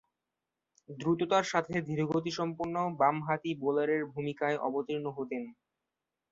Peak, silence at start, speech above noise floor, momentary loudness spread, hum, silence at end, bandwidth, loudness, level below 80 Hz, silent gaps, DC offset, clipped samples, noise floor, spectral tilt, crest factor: -12 dBFS; 0.9 s; 56 dB; 9 LU; none; 0.8 s; 7.8 kHz; -32 LUFS; -72 dBFS; none; under 0.1%; under 0.1%; -88 dBFS; -6 dB/octave; 22 dB